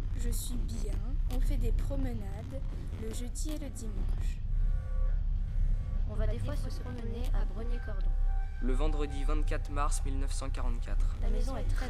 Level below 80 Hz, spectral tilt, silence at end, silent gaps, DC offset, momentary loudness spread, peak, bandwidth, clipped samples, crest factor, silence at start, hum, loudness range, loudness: -30 dBFS; -6 dB/octave; 0 s; none; under 0.1%; 5 LU; -18 dBFS; 12.5 kHz; under 0.1%; 14 dB; 0 s; none; 2 LU; -36 LUFS